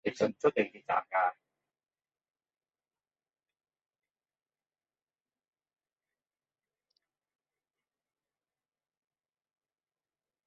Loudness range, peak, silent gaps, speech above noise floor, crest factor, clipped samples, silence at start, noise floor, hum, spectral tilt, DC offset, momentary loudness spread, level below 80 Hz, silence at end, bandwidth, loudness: 6 LU; -14 dBFS; none; over 59 dB; 26 dB; under 0.1%; 0.05 s; under -90 dBFS; none; -3.5 dB/octave; under 0.1%; 4 LU; -82 dBFS; 9.15 s; 7.4 kHz; -31 LUFS